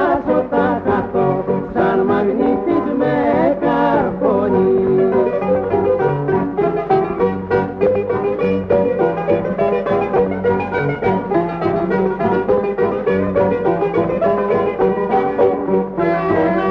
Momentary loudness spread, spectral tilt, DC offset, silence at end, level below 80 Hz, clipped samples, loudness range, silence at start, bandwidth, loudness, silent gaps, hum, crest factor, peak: 3 LU; -9.5 dB/octave; under 0.1%; 0 s; -44 dBFS; under 0.1%; 2 LU; 0 s; 5.6 kHz; -17 LUFS; none; none; 14 dB; -2 dBFS